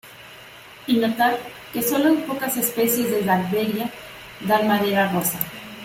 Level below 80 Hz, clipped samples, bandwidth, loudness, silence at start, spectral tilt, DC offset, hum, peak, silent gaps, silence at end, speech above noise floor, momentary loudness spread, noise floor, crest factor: -60 dBFS; under 0.1%; 16.5 kHz; -21 LUFS; 0.05 s; -4 dB/octave; under 0.1%; none; -4 dBFS; none; 0 s; 22 dB; 19 LU; -43 dBFS; 18 dB